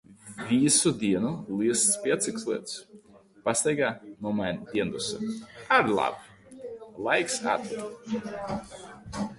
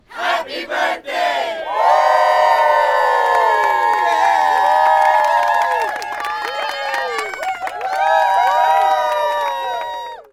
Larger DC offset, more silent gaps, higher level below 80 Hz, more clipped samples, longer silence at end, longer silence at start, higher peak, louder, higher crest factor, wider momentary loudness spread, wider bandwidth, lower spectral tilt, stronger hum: neither; neither; about the same, -60 dBFS vs -60 dBFS; neither; about the same, 0 s vs 0.1 s; about the same, 0.1 s vs 0.1 s; second, -8 dBFS vs -4 dBFS; second, -27 LUFS vs -16 LUFS; first, 20 dB vs 12 dB; first, 18 LU vs 10 LU; second, 11.5 kHz vs 16.5 kHz; first, -3.5 dB/octave vs -1 dB/octave; neither